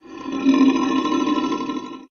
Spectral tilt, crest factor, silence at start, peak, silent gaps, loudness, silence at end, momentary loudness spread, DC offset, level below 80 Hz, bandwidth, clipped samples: -4.5 dB/octave; 16 dB; 0.05 s; -4 dBFS; none; -20 LUFS; 0.05 s; 12 LU; under 0.1%; -58 dBFS; 6.8 kHz; under 0.1%